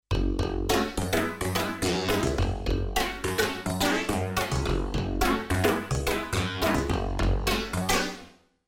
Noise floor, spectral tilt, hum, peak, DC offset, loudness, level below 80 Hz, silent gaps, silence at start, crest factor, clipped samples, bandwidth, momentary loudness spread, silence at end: -50 dBFS; -4.5 dB/octave; none; -10 dBFS; under 0.1%; -27 LUFS; -34 dBFS; none; 0.1 s; 16 dB; under 0.1%; 18 kHz; 3 LU; 0.4 s